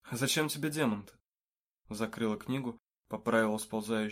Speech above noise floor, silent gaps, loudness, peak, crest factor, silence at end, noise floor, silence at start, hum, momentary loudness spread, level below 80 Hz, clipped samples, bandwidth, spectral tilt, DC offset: over 57 dB; 1.27-1.33 s, 1.44-1.48 s, 1.59-1.75 s, 2.84-2.88 s; -33 LUFS; -16 dBFS; 18 dB; 0 s; under -90 dBFS; 0.05 s; none; 11 LU; -70 dBFS; under 0.1%; 16 kHz; -4.5 dB/octave; under 0.1%